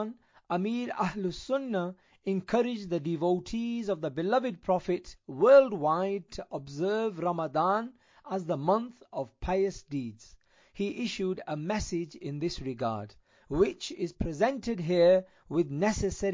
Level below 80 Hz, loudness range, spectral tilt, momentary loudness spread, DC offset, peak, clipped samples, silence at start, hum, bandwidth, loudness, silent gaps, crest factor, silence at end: -52 dBFS; 7 LU; -6 dB/octave; 11 LU; under 0.1%; -10 dBFS; under 0.1%; 0 s; none; 7.6 kHz; -30 LUFS; none; 20 dB; 0 s